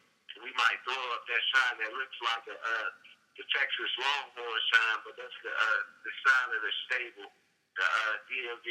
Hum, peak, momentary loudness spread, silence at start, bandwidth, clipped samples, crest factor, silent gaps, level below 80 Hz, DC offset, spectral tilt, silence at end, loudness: none; -10 dBFS; 13 LU; 0.3 s; 13 kHz; under 0.1%; 22 dB; none; under -90 dBFS; under 0.1%; 1.5 dB/octave; 0 s; -30 LUFS